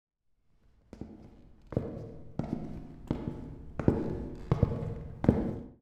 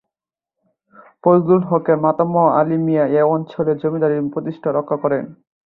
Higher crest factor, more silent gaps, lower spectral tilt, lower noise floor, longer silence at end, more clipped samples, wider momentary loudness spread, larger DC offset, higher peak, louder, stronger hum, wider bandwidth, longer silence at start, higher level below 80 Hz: first, 26 dB vs 16 dB; neither; second, -10 dB/octave vs -12 dB/octave; second, -69 dBFS vs -88 dBFS; second, 0.05 s vs 0.35 s; neither; first, 18 LU vs 7 LU; neither; second, -8 dBFS vs -2 dBFS; second, -34 LUFS vs -17 LUFS; neither; first, 8.6 kHz vs 4.2 kHz; second, 0.95 s vs 1.25 s; first, -44 dBFS vs -62 dBFS